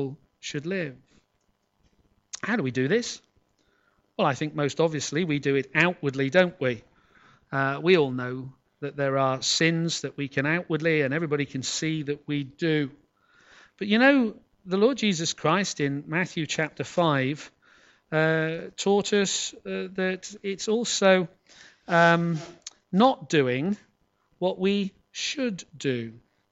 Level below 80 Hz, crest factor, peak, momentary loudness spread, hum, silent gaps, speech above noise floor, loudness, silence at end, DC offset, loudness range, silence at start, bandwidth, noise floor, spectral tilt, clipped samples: -68 dBFS; 20 dB; -6 dBFS; 13 LU; none; none; 47 dB; -25 LUFS; 0.35 s; under 0.1%; 4 LU; 0 s; 8.2 kHz; -72 dBFS; -4.5 dB/octave; under 0.1%